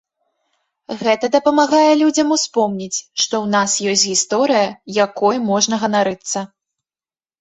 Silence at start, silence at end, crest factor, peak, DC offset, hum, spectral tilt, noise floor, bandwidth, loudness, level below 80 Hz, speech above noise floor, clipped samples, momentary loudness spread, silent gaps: 0.9 s; 0.95 s; 16 dB; -2 dBFS; under 0.1%; none; -3 dB/octave; under -90 dBFS; 8.4 kHz; -16 LUFS; -62 dBFS; over 74 dB; under 0.1%; 10 LU; none